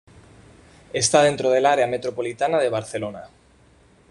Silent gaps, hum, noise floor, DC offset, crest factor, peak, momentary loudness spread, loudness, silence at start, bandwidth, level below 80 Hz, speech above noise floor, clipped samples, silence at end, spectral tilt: none; none; -55 dBFS; under 0.1%; 20 dB; -2 dBFS; 13 LU; -21 LUFS; 0.95 s; 11.5 kHz; -58 dBFS; 34 dB; under 0.1%; 0.85 s; -3.5 dB/octave